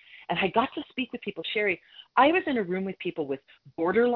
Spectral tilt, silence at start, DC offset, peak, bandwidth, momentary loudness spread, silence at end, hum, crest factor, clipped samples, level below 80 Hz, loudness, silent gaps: -8.5 dB/octave; 0.15 s; under 0.1%; -8 dBFS; 5.4 kHz; 12 LU; 0 s; none; 20 dB; under 0.1%; -66 dBFS; -28 LUFS; none